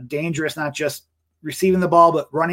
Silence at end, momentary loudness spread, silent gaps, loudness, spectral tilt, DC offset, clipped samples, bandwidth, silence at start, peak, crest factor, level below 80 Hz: 0 s; 17 LU; none; -19 LUFS; -5.5 dB/octave; under 0.1%; under 0.1%; 16.5 kHz; 0 s; -2 dBFS; 18 dB; -58 dBFS